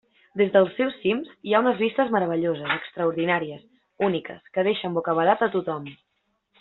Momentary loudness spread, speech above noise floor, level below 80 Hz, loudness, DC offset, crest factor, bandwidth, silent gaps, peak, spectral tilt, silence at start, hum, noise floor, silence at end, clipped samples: 11 LU; 50 dB; -68 dBFS; -24 LUFS; under 0.1%; 20 dB; 4.2 kHz; none; -4 dBFS; -4 dB/octave; 0.35 s; none; -73 dBFS; 0.65 s; under 0.1%